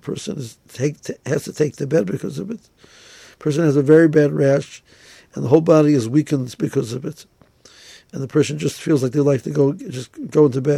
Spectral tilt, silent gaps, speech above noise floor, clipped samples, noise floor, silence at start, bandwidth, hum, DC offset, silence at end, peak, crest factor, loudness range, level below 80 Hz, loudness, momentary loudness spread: -7 dB/octave; none; 32 dB; under 0.1%; -50 dBFS; 0.05 s; 14.5 kHz; none; under 0.1%; 0 s; 0 dBFS; 18 dB; 6 LU; -60 dBFS; -18 LUFS; 18 LU